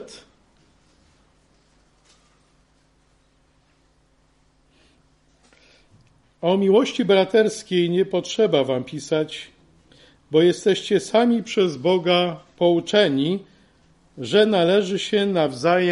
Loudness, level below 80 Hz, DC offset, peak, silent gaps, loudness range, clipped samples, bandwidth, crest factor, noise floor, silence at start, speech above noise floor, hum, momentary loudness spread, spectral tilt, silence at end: -20 LUFS; -64 dBFS; under 0.1%; -4 dBFS; none; 3 LU; under 0.1%; 11.5 kHz; 20 dB; -61 dBFS; 0 s; 41 dB; none; 9 LU; -5.5 dB/octave; 0 s